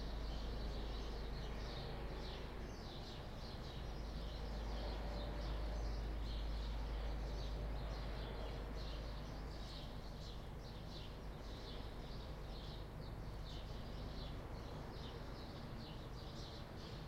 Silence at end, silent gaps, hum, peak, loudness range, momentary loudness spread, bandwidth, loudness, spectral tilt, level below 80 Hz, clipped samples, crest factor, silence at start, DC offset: 0 s; none; none; -34 dBFS; 5 LU; 5 LU; 14.5 kHz; -49 LUFS; -6 dB/octave; -48 dBFS; under 0.1%; 12 dB; 0 s; under 0.1%